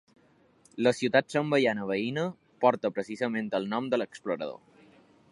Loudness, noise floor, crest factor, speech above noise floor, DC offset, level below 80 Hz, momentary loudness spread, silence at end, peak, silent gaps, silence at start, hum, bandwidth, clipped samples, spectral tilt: -29 LUFS; -62 dBFS; 22 dB; 34 dB; under 0.1%; -76 dBFS; 9 LU; 0.75 s; -8 dBFS; none; 0.75 s; none; 11.5 kHz; under 0.1%; -5.5 dB/octave